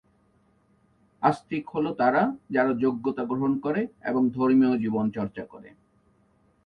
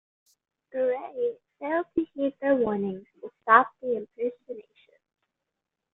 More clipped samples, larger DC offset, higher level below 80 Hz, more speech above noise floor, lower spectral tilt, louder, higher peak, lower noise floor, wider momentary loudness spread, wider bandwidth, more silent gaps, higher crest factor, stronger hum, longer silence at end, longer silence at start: neither; neither; first, -64 dBFS vs -70 dBFS; second, 40 dB vs 59 dB; about the same, -8.5 dB/octave vs -8.5 dB/octave; about the same, -25 LUFS vs -27 LUFS; second, -8 dBFS vs -2 dBFS; second, -64 dBFS vs -86 dBFS; second, 10 LU vs 20 LU; first, 5.8 kHz vs 4 kHz; neither; second, 18 dB vs 26 dB; neither; second, 0.95 s vs 1.3 s; first, 1.2 s vs 0.75 s